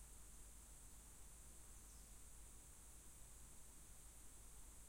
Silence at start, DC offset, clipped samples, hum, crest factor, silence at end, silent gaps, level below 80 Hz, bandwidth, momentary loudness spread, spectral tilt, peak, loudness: 0 s; under 0.1%; under 0.1%; none; 12 dB; 0 s; none; -64 dBFS; 16.5 kHz; 1 LU; -2.5 dB/octave; -48 dBFS; -61 LUFS